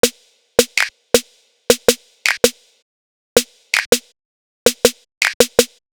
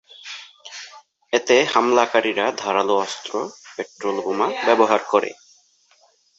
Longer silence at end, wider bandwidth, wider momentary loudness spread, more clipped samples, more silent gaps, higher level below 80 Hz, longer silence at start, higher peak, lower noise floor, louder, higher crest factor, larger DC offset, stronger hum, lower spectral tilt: second, 0.25 s vs 1.05 s; first, over 20 kHz vs 8 kHz; second, 4 LU vs 19 LU; neither; first, 2.82-3.36 s, 3.86-3.92 s, 4.25-4.66 s, 5.17-5.21 s, 5.34-5.40 s vs none; first, -50 dBFS vs -72 dBFS; second, 0.05 s vs 0.25 s; about the same, 0 dBFS vs -2 dBFS; second, -42 dBFS vs -58 dBFS; first, -17 LUFS vs -20 LUFS; about the same, 18 dB vs 20 dB; neither; neither; second, -1 dB/octave vs -3 dB/octave